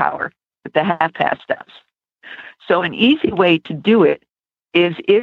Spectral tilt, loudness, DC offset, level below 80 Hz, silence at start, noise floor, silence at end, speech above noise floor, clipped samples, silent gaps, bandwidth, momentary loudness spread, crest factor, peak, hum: -8 dB/octave; -17 LUFS; under 0.1%; -58 dBFS; 0 s; -41 dBFS; 0 s; 25 dB; under 0.1%; none; 5.2 kHz; 13 LU; 16 dB; -2 dBFS; none